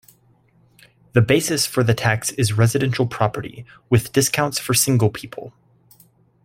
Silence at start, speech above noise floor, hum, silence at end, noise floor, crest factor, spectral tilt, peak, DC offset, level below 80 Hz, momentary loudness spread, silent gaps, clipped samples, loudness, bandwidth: 1.15 s; 38 dB; none; 0.95 s; -57 dBFS; 18 dB; -4.5 dB/octave; -2 dBFS; under 0.1%; -52 dBFS; 11 LU; none; under 0.1%; -19 LUFS; 16.5 kHz